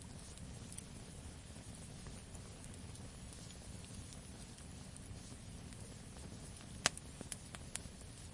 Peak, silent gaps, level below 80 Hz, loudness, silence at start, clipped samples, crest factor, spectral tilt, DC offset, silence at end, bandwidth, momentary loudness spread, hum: -8 dBFS; none; -58 dBFS; -49 LUFS; 0 s; under 0.1%; 42 dB; -3 dB/octave; under 0.1%; 0 s; 11.5 kHz; 6 LU; none